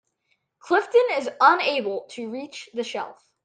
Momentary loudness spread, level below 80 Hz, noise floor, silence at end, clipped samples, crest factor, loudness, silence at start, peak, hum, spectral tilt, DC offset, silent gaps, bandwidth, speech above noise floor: 16 LU; -80 dBFS; -72 dBFS; 0.35 s; under 0.1%; 22 dB; -22 LUFS; 0.65 s; -2 dBFS; none; -3 dB/octave; under 0.1%; none; 9.4 kHz; 50 dB